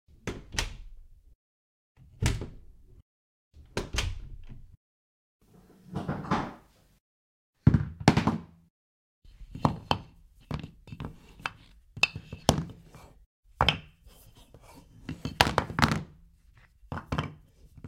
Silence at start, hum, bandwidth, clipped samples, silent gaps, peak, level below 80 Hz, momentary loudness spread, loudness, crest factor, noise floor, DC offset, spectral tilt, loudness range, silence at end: 0.25 s; none; 16 kHz; under 0.1%; 1.35-1.95 s, 3.02-3.51 s, 4.77-5.40 s, 7.00-7.53 s, 8.70-9.22 s, 13.26-13.43 s; -2 dBFS; -44 dBFS; 20 LU; -30 LUFS; 32 dB; -59 dBFS; under 0.1%; -5 dB/octave; 9 LU; 0 s